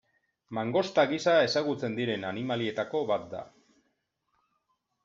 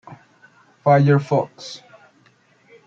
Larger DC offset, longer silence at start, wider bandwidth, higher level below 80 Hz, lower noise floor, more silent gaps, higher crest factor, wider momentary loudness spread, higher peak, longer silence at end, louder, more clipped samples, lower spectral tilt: neither; first, 0.5 s vs 0.1 s; about the same, 7.8 kHz vs 7.4 kHz; second, -74 dBFS vs -66 dBFS; first, -78 dBFS vs -57 dBFS; neither; about the same, 20 dB vs 18 dB; second, 10 LU vs 21 LU; second, -12 dBFS vs -4 dBFS; first, 1.55 s vs 1.1 s; second, -29 LUFS vs -18 LUFS; neither; second, -3.5 dB/octave vs -8 dB/octave